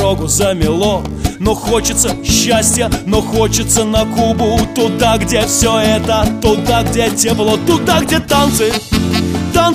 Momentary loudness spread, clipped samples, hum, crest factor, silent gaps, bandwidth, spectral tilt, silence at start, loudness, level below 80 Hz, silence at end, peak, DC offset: 4 LU; under 0.1%; none; 12 dB; none; 15.5 kHz; -4 dB/octave; 0 s; -13 LUFS; -26 dBFS; 0 s; 0 dBFS; under 0.1%